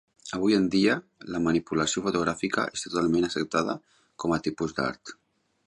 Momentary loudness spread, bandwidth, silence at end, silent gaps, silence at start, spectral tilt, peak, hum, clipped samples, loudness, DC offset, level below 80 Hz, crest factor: 10 LU; 11.5 kHz; 0.55 s; none; 0.25 s; -4.5 dB/octave; -10 dBFS; none; under 0.1%; -27 LUFS; under 0.1%; -56 dBFS; 18 dB